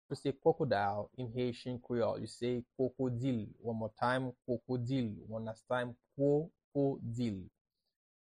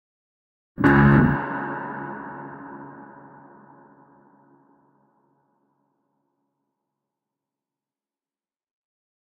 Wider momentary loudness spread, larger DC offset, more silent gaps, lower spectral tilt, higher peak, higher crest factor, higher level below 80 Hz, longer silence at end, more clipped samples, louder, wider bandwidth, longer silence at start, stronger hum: second, 9 LU vs 25 LU; neither; first, 6.64-6.71 s vs none; second, -7.5 dB/octave vs -9.5 dB/octave; second, -18 dBFS vs -4 dBFS; about the same, 20 dB vs 24 dB; second, -68 dBFS vs -44 dBFS; second, 0.7 s vs 6.25 s; neither; second, -37 LUFS vs -20 LUFS; first, 10.5 kHz vs 4.9 kHz; second, 0.1 s vs 0.8 s; neither